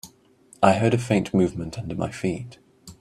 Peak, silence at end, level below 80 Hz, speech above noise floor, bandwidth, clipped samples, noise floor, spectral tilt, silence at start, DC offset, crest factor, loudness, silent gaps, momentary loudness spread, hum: -2 dBFS; 0.1 s; -52 dBFS; 33 dB; 14.5 kHz; under 0.1%; -55 dBFS; -6.5 dB/octave; 0.05 s; under 0.1%; 22 dB; -23 LUFS; none; 13 LU; none